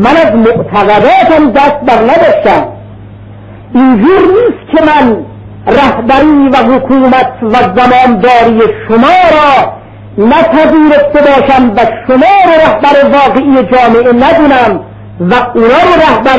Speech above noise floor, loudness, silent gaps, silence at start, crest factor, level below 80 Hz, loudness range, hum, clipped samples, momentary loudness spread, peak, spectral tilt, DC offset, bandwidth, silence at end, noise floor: 23 dB; -5 LUFS; none; 0 s; 6 dB; -32 dBFS; 2 LU; none; 1%; 5 LU; 0 dBFS; -7 dB/octave; 0.7%; 8 kHz; 0 s; -28 dBFS